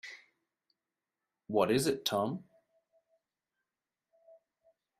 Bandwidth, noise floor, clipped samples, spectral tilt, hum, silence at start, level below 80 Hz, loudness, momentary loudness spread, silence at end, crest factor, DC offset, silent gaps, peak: 14 kHz; under -90 dBFS; under 0.1%; -4.5 dB/octave; none; 0.05 s; -74 dBFS; -32 LUFS; 19 LU; 2.55 s; 24 dB; under 0.1%; none; -14 dBFS